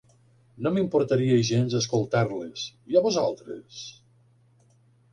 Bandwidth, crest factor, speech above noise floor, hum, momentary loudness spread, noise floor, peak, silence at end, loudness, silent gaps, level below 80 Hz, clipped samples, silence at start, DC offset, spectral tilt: 10 kHz; 18 dB; 36 dB; none; 17 LU; -61 dBFS; -8 dBFS; 1.2 s; -25 LUFS; none; -64 dBFS; under 0.1%; 0.6 s; under 0.1%; -6 dB/octave